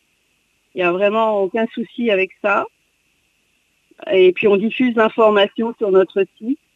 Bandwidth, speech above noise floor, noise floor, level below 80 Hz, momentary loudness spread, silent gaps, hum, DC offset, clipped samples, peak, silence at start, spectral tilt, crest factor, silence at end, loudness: 4.2 kHz; 47 dB; -64 dBFS; -66 dBFS; 9 LU; none; none; under 0.1%; under 0.1%; -2 dBFS; 0.75 s; -7 dB/octave; 16 dB; 0.2 s; -17 LUFS